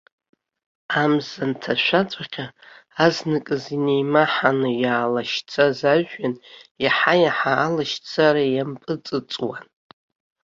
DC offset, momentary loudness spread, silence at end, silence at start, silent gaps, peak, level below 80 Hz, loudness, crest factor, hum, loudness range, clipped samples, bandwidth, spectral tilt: under 0.1%; 11 LU; 0.8 s; 0.9 s; 6.71-6.75 s; -2 dBFS; -64 dBFS; -21 LUFS; 20 dB; none; 3 LU; under 0.1%; 7.6 kHz; -5.5 dB/octave